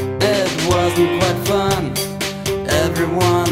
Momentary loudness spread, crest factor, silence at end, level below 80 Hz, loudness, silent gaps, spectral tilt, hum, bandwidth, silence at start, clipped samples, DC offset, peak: 6 LU; 16 dB; 0 s; -38 dBFS; -17 LUFS; none; -4.5 dB/octave; none; 16.5 kHz; 0 s; under 0.1%; under 0.1%; -2 dBFS